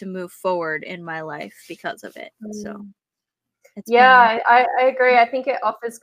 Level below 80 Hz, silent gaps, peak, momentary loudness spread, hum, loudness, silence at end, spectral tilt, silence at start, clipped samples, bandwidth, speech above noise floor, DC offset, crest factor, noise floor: -70 dBFS; none; -2 dBFS; 23 LU; none; -16 LUFS; 0.05 s; -4 dB/octave; 0 s; under 0.1%; 15.5 kHz; 66 dB; under 0.1%; 18 dB; -85 dBFS